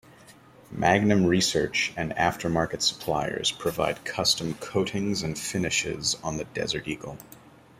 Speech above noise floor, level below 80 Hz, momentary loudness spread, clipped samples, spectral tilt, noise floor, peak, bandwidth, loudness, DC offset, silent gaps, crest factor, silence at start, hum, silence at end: 25 dB; -54 dBFS; 9 LU; under 0.1%; -3.5 dB/octave; -52 dBFS; -6 dBFS; 16 kHz; -26 LUFS; under 0.1%; none; 22 dB; 0.3 s; none; 0.4 s